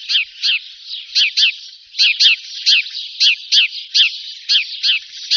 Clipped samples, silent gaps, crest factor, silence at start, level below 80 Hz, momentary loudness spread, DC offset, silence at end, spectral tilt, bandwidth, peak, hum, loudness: under 0.1%; none; 16 dB; 0 s; -78 dBFS; 14 LU; under 0.1%; 0 s; 14 dB/octave; 7.2 kHz; -2 dBFS; none; -13 LUFS